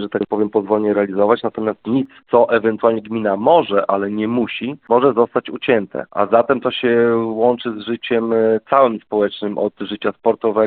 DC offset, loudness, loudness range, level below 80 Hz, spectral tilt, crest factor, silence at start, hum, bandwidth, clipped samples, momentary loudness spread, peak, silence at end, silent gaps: under 0.1%; -17 LUFS; 1 LU; -60 dBFS; -4 dB/octave; 16 dB; 0 s; none; 4.5 kHz; under 0.1%; 8 LU; 0 dBFS; 0 s; none